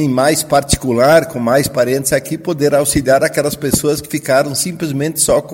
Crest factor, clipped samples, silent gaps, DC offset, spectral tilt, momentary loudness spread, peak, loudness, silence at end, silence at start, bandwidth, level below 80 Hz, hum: 14 dB; under 0.1%; none; under 0.1%; -4 dB/octave; 6 LU; 0 dBFS; -14 LUFS; 0 s; 0 s; 17 kHz; -36 dBFS; none